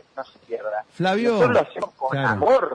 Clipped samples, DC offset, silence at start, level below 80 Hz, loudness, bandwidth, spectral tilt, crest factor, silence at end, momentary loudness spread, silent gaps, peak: under 0.1%; under 0.1%; 0.15 s; -60 dBFS; -22 LUFS; 10 kHz; -6.5 dB/octave; 14 dB; 0 s; 14 LU; none; -8 dBFS